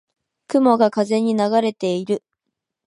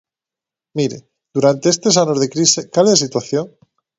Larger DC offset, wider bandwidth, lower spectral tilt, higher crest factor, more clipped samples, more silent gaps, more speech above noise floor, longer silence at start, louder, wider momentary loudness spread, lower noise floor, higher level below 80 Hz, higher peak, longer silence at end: neither; first, 11 kHz vs 8 kHz; first, -6 dB/octave vs -4 dB/octave; about the same, 18 dB vs 18 dB; neither; neither; second, 62 dB vs 72 dB; second, 0.5 s vs 0.75 s; second, -19 LUFS vs -15 LUFS; second, 8 LU vs 12 LU; second, -80 dBFS vs -88 dBFS; second, -72 dBFS vs -60 dBFS; about the same, -2 dBFS vs 0 dBFS; first, 0.7 s vs 0.5 s